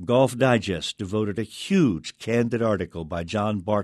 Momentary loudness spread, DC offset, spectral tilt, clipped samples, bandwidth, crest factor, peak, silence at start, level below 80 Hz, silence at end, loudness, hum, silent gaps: 9 LU; under 0.1%; -6 dB/octave; under 0.1%; 12.5 kHz; 16 dB; -6 dBFS; 0 s; -52 dBFS; 0 s; -24 LUFS; none; none